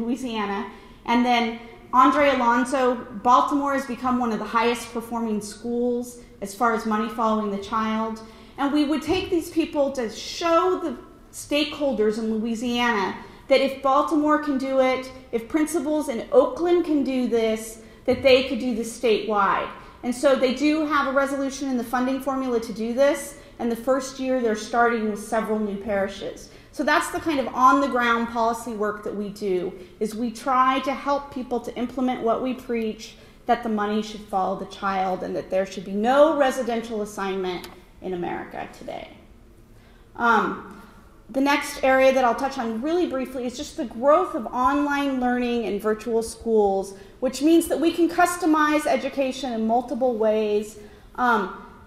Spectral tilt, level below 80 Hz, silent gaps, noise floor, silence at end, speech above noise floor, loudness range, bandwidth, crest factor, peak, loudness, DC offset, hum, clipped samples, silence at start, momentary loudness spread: -4.5 dB/octave; -52 dBFS; none; -50 dBFS; 0 s; 27 dB; 4 LU; 16 kHz; 20 dB; -2 dBFS; -23 LUFS; under 0.1%; none; under 0.1%; 0 s; 12 LU